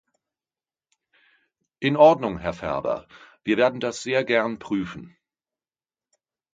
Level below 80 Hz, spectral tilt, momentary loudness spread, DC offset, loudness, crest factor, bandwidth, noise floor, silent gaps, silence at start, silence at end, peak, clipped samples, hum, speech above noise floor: -56 dBFS; -5.5 dB/octave; 15 LU; under 0.1%; -23 LUFS; 22 dB; 9.2 kHz; under -90 dBFS; none; 1.8 s; 1.45 s; -4 dBFS; under 0.1%; none; over 68 dB